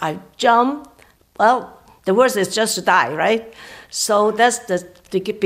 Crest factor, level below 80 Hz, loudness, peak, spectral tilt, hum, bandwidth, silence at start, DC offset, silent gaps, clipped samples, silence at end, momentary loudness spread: 16 dB; -60 dBFS; -18 LUFS; -2 dBFS; -3 dB/octave; none; 16 kHz; 0 s; under 0.1%; none; under 0.1%; 0 s; 12 LU